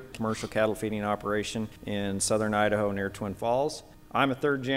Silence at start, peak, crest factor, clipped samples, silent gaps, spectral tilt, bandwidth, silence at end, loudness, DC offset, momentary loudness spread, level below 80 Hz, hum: 0 s; -10 dBFS; 20 dB; under 0.1%; none; -4.5 dB/octave; 16 kHz; 0 s; -29 LUFS; under 0.1%; 8 LU; -54 dBFS; none